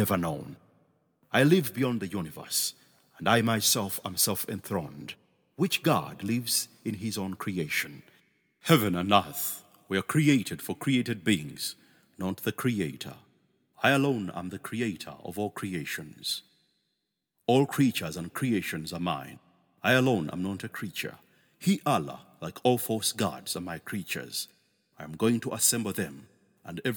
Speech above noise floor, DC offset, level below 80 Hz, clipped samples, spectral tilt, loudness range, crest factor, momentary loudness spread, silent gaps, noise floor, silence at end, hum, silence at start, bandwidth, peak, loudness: 53 dB; under 0.1%; -66 dBFS; under 0.1%; -4 dB/octave; 4 LU; 24 dB; 13 LU; none; -81 dBFS; 0 s; none; 0 s; over 20 kHz; -4 dBFS; -29 LUFS